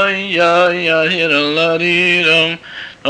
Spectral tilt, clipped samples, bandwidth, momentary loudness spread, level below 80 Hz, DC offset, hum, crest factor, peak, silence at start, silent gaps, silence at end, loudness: -4.5 dB/octave; under 0.1%; 10 kHz; 5 LU; -58 dBFS; under 0.1%; none; 12 dB; -2 dBFS; 0 s; none; 0 s; -12 LUFS